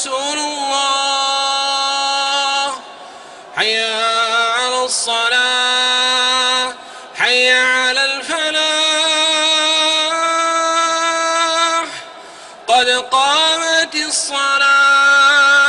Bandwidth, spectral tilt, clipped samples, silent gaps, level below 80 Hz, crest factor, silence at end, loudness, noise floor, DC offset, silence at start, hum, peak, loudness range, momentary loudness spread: 11 kHz; 1.5 dB/octave; under 0.1%; none; -64 dBFS; 14 dB; 0 s; -13 LUFS; -36 dBFS; under 0.1%; 0 s; none; -2 dBFS; 4 LU; 8 LU